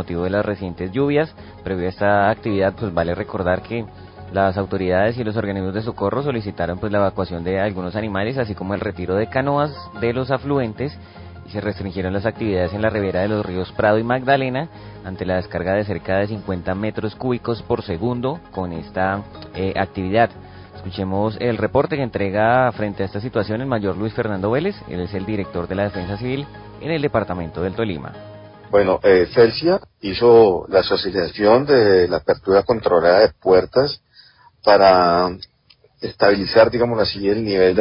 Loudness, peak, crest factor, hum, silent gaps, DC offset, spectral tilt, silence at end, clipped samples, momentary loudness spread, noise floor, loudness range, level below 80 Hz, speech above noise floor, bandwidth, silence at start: -19 LUFS; -2 dBFS; 16 dB; none; none; under 0.1%; -11 dB/octave; 0 s; under 0.1%; 13 LU; -55 dBFS; 8 LU; -42 dBFS; 36 dB; 5.4 kHz; 0 s